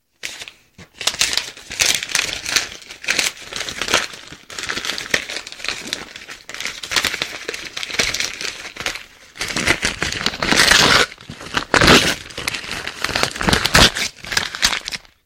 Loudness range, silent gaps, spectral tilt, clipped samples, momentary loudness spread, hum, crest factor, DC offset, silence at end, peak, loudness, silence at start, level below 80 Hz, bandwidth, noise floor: 8 LU; none; -1.5 dB/octave; under 0.1%; 17 LU; none; 20 dB; under 0.1%; 0.25 s; 0 dBFS; -18 LUFS; 0.25 s; -38 dBFS; 17.5 kHz; -45 dBFS